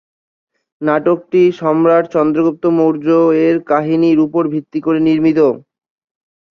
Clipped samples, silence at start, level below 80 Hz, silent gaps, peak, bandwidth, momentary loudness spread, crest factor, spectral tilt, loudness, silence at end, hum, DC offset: under 0.1%; 0.8 s; -58 dBFS; none; -2 dBFS; 6.2 kHz; 6 LU; 12 dB; -8.5 dB/octave; -13 LUFS; 0.9 s; none; under 0.1%